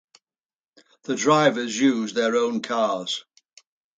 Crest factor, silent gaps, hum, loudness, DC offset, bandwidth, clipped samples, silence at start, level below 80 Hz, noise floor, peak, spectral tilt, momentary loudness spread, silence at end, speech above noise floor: 20 dB; none; none; -22 LUFS; under 0.1%; 9.4 kHz; under 0.1%; 1.1 s; -74 dBFS; -63 dBFS; -4 dBFS; -4 dB/octave; 12 LU; 0.75 s; 41 dB